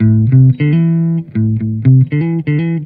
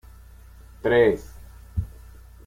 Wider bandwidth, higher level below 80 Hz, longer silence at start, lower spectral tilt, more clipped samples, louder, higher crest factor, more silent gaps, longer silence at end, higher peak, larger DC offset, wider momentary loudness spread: second, 3.4 kHz vs 16 kHz; about the same, -44 dBFS vs -42 dBFS; second, 0 s vs 0.85 s; first, -13 dB/octave vs -7 dB/octave; neither; first, -12 LUFS vs -23 LUFS; second, 10 dB vs 18 dB; neither; second, 0 s vs 0.6 s; first, 0 dBFS vs -8 dBFS; neither; second, 6 LU vs 19 LU